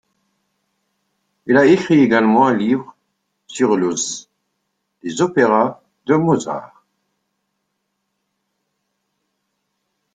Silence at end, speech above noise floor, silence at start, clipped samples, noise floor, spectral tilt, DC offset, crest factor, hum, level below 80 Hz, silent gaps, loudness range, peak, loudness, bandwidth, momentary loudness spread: 3.5 s; 58 dB; 1.45 s; under 0.1%; -73 dBFS; -5.5 dB/octave; under 0.1%; 18 dB; none; -62 dBFS; none; 8 LU; -2 dBFS; -16 LUFS; 9.6 kHz; 17 LU